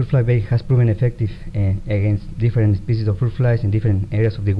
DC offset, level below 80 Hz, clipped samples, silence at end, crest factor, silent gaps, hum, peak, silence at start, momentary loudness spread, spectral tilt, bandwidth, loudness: under 0.1%; -34 dBFS; under 0.1%; 0 s; 12 dB; none; none; -6 dBFS; 0 s; 4 LU; -10 dB/octave; 5.4 kHz; -19 LUFS